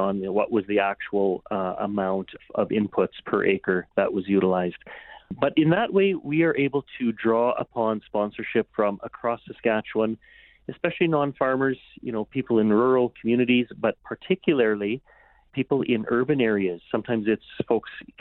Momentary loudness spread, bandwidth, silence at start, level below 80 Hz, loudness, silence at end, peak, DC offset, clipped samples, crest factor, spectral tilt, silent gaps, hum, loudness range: 9 LU; 4.2 kHz; 0 s; -62 dBFS; -24 LUFS; 0.2 s; -8 dBFS; under 0.1%; under 0.1%; 16 dB; -11 dB/octave; none; none; 3 LU